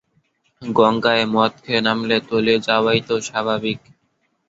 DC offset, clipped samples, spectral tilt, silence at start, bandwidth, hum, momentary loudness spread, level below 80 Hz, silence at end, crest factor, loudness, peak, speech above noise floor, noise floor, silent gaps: under 0.1%; under 0.1%; -4.5 dB/octave; 0.6 s; 7.8 kHz; none; 7 LU; -58 dBFS; 0.7 s; 18 dB; -18 LUFS; -2 dBFS; 49 dB; -68 dBFS; none